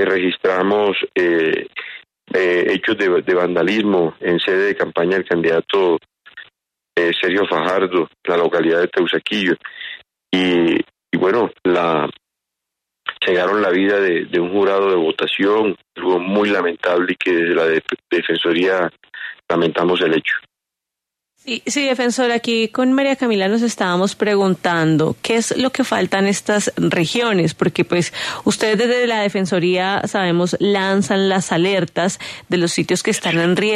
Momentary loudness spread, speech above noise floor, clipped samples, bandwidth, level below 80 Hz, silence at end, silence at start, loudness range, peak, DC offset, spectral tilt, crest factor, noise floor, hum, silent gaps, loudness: 6 LU; 67 dB; under 0.1%; 13.5 kHz; -60 dBFS; 0 s; 0 s; 2 LU; -2 dBFS; under 0.1%; -4.5 dB/octave; 14 dB; -84 dBFS; none; none; -17 LUFS